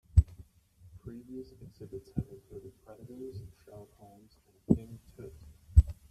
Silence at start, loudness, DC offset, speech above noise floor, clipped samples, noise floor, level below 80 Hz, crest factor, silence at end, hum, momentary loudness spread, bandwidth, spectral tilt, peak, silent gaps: 0.15 s; -32 LUFS; under 0.1%; 20 dB; under 0.1%; -60 dBFS; -38 dBFS; 26 dB; 0.2 s; none; 26 LU; 8.4 kHz; -10 dB/octave; -8 dBFS; none